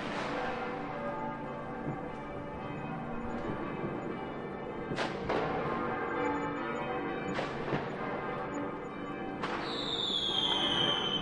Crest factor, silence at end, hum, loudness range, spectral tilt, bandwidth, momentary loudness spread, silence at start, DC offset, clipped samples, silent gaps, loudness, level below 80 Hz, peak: 20 dB; 0 s; none; 6 LU; -5 dB/octave; 11 kHz; 11 LU; 0 s; under 0.1%; under 0.1%; none; -35 LUFS; -56 dBFS; -16 dBFS